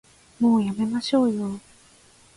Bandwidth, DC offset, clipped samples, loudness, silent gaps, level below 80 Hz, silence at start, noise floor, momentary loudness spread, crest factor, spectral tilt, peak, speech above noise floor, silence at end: 11.5 kHz; under 0.1%; under 0.1%; -23 LUFS; none; -62 dBFS; 0.4 s; -54 dBFS; 11 LU; 16 dB; -6.5 dB/octave; -10 dBFS; 33 dB; 0.75 s